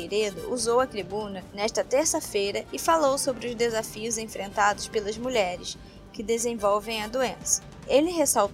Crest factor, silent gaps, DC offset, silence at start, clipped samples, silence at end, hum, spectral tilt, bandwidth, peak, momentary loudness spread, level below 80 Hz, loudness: 18 dB; none; under 0.1%; 0 s; under 0.1%; 0 s; none; -2.5 dB/octave; 16 kHz; -8 dBFS; 9 LU; -52 dBFS; -26 LUFS